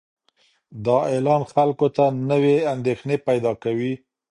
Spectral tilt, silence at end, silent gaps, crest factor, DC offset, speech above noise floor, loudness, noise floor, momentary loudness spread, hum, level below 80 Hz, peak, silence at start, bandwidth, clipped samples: -7.5 dB/octave; 0.35 s; none; 16 dB; under 0.1%; 43 dB; -21 LUFS; -63 dBFS; 7 LU; none; -62 dBFS; -4 dBFS; 0.7 s; 11 kHz; under 0.1%